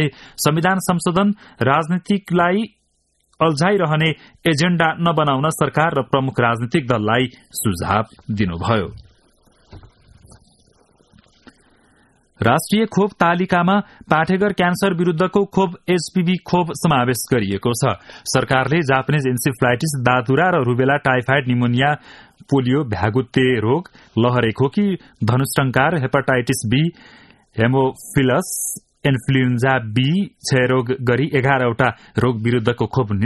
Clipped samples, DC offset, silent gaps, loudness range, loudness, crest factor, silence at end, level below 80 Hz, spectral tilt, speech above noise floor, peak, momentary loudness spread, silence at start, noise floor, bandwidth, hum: under 0.1%; under 0.1%; none; 4 LU; -18 LUFS; 18 dB; 0 s; -48 dBFS; -5.5 dB/octave; 48 dB; 0 dBFS; 5 LU; 0 s; -65 dBFS; 12.5 kHz; none